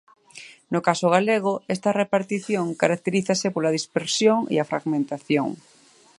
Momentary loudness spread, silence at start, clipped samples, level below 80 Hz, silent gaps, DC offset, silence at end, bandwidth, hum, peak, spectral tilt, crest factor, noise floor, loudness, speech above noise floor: 8 LU; 0.35 s; under 0.1%; -70 dBFS; none; under 0.1%; 0.65 s; 11.5 kHz; none; -2 dBFS; -4.5 dB/octave; 20 dB; -46 dBFS; -23 LUFS; 24 dB